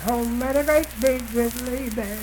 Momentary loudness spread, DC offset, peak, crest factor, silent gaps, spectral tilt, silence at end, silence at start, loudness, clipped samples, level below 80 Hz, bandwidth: 8 LU; under 0.1%; -4 dBFS; 18 dB; none; -4.5 dB/octave; 0 s; 0 s; -23 LUFS; under 0.1%; -38 dBFS; 19 kHz